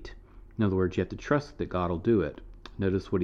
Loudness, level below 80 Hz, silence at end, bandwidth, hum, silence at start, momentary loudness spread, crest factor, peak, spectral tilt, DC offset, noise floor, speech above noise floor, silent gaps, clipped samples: -29 LUFS; -48 dBFS; 0 s; 7.6 kHz; none; 0 s; 19 LU; 18 dB; -12 dBFS; -8 dB/octave; under 0.1%; -48 dBFS; 20 dB; none; under 0.1%